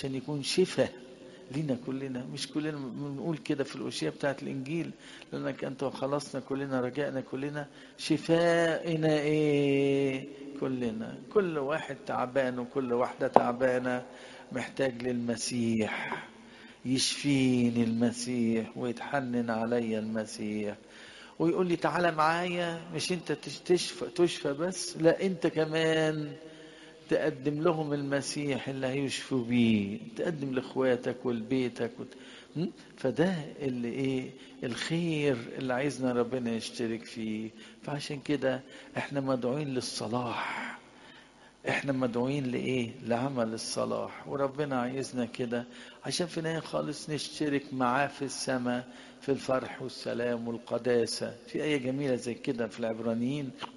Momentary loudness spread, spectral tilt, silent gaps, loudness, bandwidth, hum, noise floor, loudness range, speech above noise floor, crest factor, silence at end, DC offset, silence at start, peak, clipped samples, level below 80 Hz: 11 LU; -5 dB/octave; none; -31 LUFS; 11.5 kHz; none; -56 dBFS; 5 LU; 25 dB; 30 dB; 0 s; under 0.1%; 0 s; 0 dBFS; under 0.1%; -68 dBFS